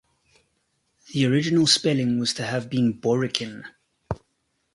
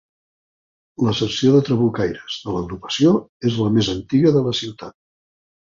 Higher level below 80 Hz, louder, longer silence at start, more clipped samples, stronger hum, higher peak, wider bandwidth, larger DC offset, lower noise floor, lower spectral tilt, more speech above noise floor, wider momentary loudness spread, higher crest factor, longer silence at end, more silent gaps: second, -54 dBFS vs -48 dBFS; second, -22 LUFS vs -19 LUFS; about the same, 1.1 s vs 1 s; neither; neither; about the same, -2 dBFS vs -4 dBFS; first, 11.5 kHz vs 7.6 kHz; neither; second, -73 dBFS vs under -90 dBFS; second, -4.5 dB/octave vs -6.5 dB/octave; second, 50 dB vs over 72 dB; first, 17 LU vs 11 LU; first, 24 dB vs 16 dB; second, 0.6 s vs 0.8 s; second, none vs 3.29-3.40 s